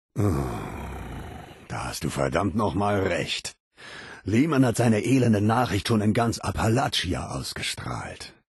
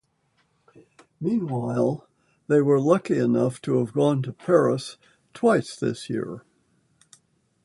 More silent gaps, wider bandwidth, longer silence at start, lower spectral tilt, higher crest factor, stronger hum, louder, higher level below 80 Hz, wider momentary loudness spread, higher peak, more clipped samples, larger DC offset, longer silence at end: first, 3.60-3.71 s vs none; about the same, 12.5 kHz vs 11.5 kHz; second, 0.15 s vs 1.2 s; second, -5.5 dB/octave vs -7 dB/octave; about the same, 16 dB vs 20 dB; neither; about the same, -25 LUFS vs -23 LUFS; first, -44 dBFS vs -66 dBFS; first, 17 LU vs 11 LU; about the same, -8 dBFS vs -6 dBFS; neither; neither; second, 0.2 s vs 1.25 s